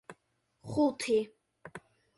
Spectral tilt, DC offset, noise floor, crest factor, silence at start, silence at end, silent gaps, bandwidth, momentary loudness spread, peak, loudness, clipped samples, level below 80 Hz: -5 dB/octave; under 0.1%; -76 dBFS; 16 dB; 0.1 s; 0.4 s; none; 11.5 kHz; 22 LU; -18 dBFS; -31 LUFS; under 0.1%; -68 dBFS